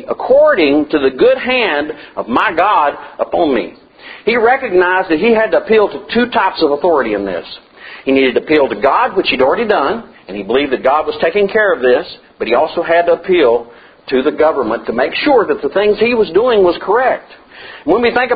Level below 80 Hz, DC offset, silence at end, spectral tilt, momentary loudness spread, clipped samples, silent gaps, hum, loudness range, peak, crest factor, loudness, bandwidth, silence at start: -46 dBFS; under 0.1%; 0 s; -7.5 dB/octave; 11 LU; under 0.1%; none; none; 2 LU; 0 dBFS; 12 dB; -13 LUFS; 5 kHz; 0 s